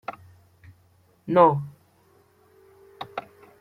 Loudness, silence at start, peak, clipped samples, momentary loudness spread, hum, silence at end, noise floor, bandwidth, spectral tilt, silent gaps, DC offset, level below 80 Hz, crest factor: -22 LUFS; 0.1 s; -4 dBFS; under 0.1%; 23 LU; none; 0.4 s; -61 dBFS; 6 kHz; -8.5 dB/octave; none; under 0.1%; -68 dBFS; 24 dB